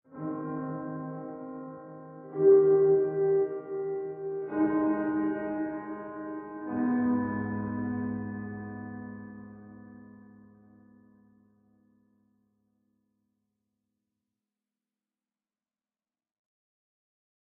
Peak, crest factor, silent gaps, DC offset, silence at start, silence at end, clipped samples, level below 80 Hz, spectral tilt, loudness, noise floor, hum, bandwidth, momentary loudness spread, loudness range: -12 dBFS; 20 dB; none; under 0.1%; 0.1 s; 7.25 s; under 0.1%; -68 dBFS; -10 dB/octave; -29 LUFS; under -90 dBFS; none; 2.7 kHz; 22 LU; 16 LU